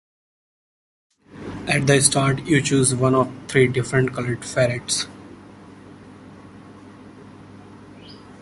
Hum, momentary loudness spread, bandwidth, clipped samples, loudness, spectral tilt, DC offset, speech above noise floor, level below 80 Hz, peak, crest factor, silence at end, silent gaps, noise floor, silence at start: none; 22 LU; 11.5 kHz; under 0.1%; -20 LUFS; -4.5 dB/octave; under 0.1%; 24 dB; -52 dBFS; 0 dBFS; 24 dB; 0.05 s; none; -43 dBFS; 1.35 s